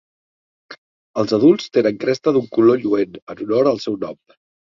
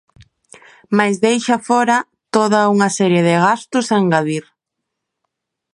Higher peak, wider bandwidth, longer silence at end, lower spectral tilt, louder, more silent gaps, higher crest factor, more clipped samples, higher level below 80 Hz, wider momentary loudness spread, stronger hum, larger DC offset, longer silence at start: about the same, -2 dBFS vs 0 dBFS; second, 7.4 kHz vs 11.5 kHz; second, 0.6 s vs 1.35 s; first, -7 dB/octave vs -5 dB/octave; second, -18 LUFS vs -15 LUFS; first, 0.78-1.14 s, 3.22-3.27 s vs none; about the same, 18 dB vs 16 dB; neither; about the same, -62 dBFS vs -64 dBFS; first, 13 LU vs 6 LU; neither; neither; second, 0.7 s vs 0.9 s